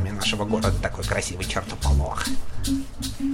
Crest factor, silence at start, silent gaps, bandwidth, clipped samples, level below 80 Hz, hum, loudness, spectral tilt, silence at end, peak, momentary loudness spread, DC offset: 14 dB; 0 s; none; 17 kHz; under 0.1%; -30 dBFS; none; -26 LUFS; -4.5 dB/octave; 0 s; -10 dBFS; 6 LU; under 0.1%